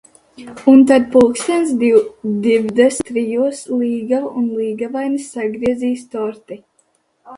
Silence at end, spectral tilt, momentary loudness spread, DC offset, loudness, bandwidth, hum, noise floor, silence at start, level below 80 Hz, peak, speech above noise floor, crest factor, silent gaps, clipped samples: 0 s; -5 dB/octave; 13 LU; under 0.1%; -16 LUFS; 11.5 kHz; none; -61 dBFS; 0.4 s; -54 dBFS; 0 dBFS; 46 dB; 16 dB; none; under 0.1%